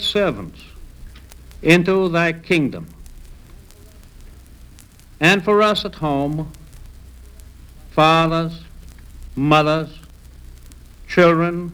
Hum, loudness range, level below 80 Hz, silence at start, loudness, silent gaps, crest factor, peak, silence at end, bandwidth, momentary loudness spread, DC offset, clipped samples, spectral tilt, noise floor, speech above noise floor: none; 2 LU; -40 dBFS; 0 s; -17 LUFS; none; 20 dB; 0 dBFS; 0 s; 19.5 kHz; 19 LU; under 0.1%; under 0.1%; -6 dB/octave; -44 dBFS; 27 dB